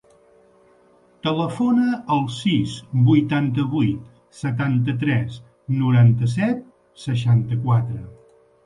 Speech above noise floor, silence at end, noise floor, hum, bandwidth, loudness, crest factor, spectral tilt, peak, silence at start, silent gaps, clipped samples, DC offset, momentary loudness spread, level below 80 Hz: 36 dB; 0.55 s; -55 dBFS; none; 10.5 kHz; -21 LUFS; 16 dB; -7.5 dB/octave; -6 dBFS; 1.25 s; none; under 0.1%; under 0.1%; 13 LU; -52 dBFS